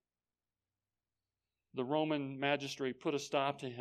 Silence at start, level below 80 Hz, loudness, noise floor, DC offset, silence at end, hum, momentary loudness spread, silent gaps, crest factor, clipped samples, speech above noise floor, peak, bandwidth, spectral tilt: 1.75 s; -84 dBFS; -37 LUFS; under -90 dBFS; under 0.1%; 0 s; 60 Hz at -70 dBFS; 5 LU; none; 20 dB; under 0.1%; over 53 dB; -18 dBFS; 13.5 kHz; -5 dB/octave